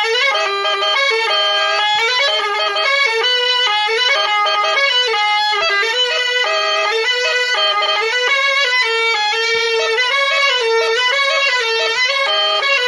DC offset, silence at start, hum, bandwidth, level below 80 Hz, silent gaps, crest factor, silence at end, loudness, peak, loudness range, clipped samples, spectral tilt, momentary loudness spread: under 0.1%; 0 s; none; 11.5 kHz; -74 dBFS; none; 12 dB; 0 s; -14 LUFS; -4 dBFS; 1 LU; under 0.1%; 2 dB/octave; 2 LU